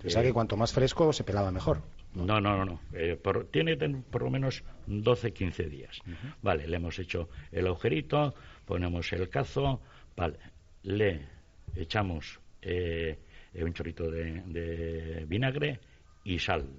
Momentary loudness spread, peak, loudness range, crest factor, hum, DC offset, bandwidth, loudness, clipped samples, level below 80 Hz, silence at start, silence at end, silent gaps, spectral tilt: 16 LU; -12 dBFS; 6 LU; 20 dB; none; under 0.1%; 7.6 kHz; -32 LUFS; under 0.1%; -48 dBFS; 0 s; 0 s; none; -5 dB/octave